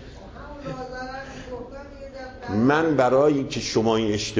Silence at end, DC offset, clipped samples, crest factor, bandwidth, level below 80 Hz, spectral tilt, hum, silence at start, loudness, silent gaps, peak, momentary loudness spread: 0 s; under 0.1%; under 0.1%; 16 dB; 8 kHz; -46 dBFS; -5.5 dB/octave; none; 0 s; -22 LUFS; none; -8 dBFS; 20 LU